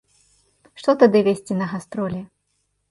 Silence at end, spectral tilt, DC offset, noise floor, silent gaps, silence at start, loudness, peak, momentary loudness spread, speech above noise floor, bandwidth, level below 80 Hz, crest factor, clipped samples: 0.65 s; -7 dB/octave; under 0.1%; -71 dBFS; none; 0.75 s; -20 LUFS; -2 dBFS; 13 LU; 52 dB; 11.5 kHz; -62 dBFS; 20 dB; under 0.1%